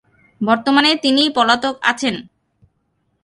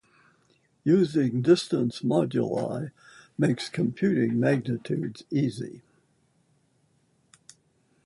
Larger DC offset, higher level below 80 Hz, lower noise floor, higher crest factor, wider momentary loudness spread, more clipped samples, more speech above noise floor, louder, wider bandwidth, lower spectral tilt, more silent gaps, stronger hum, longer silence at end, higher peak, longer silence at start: neither; first, -60 dBFS vs -66 dBFS; about the same, -67 dBFS vs -68 dBFS; about the same, 18 dB vs 20 dB; about the same, 9 LU vs 10 LU; neither; first, 51 dB vs 42 dB; first, -15 LUFS vs -26 LUFS; about the same, 11.5 kHz vs 11.5 kHz; second, -3.5 dB/octave vs -7 dB/octave; neither; neither; second, 1 s vs 2.25 s; first, 0 dBFS vs -8 dBFS; second, 0.4 s vs 0.85 s